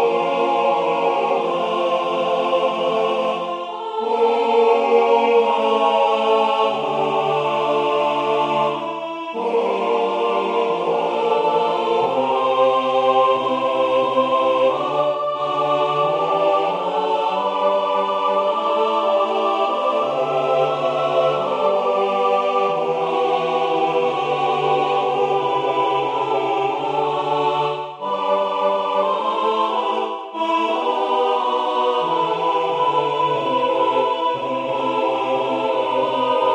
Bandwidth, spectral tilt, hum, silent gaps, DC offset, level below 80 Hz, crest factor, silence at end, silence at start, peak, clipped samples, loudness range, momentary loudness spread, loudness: 9.8 kHz; -5 dB/octave; none; none; under 0.1%; -70 dBFS; 14 dB; 0 s; 0 s; -4 dBFS; under 0.1%; 3 LU; 4 LU; -19 LUFS